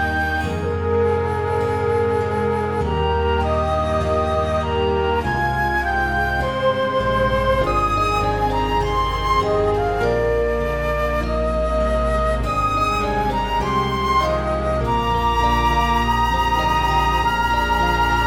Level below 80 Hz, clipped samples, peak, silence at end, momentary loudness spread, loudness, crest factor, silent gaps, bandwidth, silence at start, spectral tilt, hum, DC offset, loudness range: -28 dBFS; under 0.1%; -6 dBFS; 0 s; 3 LU; -19 LUFS; 12 dB; none; 16.5 kHz; 0 s; -6 dB/octave; none; 0.3%; 2 LU